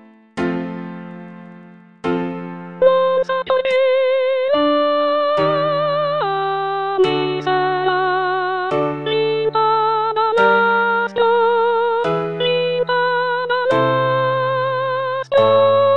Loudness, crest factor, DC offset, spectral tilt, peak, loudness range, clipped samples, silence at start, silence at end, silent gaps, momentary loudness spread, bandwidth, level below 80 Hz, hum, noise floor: -17 LUFS; 16 dB; 0.3%; -6.5 dB/octave; -2 dBFS; 3 LU; under 0.1%; 0.35 s; 0 s; none; 9 LU; 7.2 kHz; -58 dBFS; none; -42 dBFS